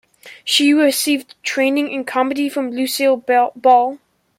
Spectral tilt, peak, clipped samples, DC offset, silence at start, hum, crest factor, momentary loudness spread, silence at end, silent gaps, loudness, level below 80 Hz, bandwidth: -1.5 dB/octave; -2 dBFS; under 0.1%; under 0.1%; 0.25 s; none; 16 dB; 8 LU; 0.45 s; none; -16 LUFS; -70 dBFS; 16.5 kHz